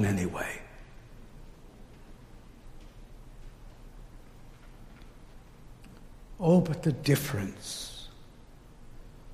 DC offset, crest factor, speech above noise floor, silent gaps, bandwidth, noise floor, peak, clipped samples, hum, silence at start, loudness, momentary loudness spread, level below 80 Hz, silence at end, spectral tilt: under 0.1%; 22 dB; 21 dB; none; 15.5 kHz; -51 dBFS; -12 dBFS; under 0.1%; 60 Hz at -60 dBFS; 0 s; -29 LUFS; 27 LU; -50 dBFS; 0 s; -6 dB/octave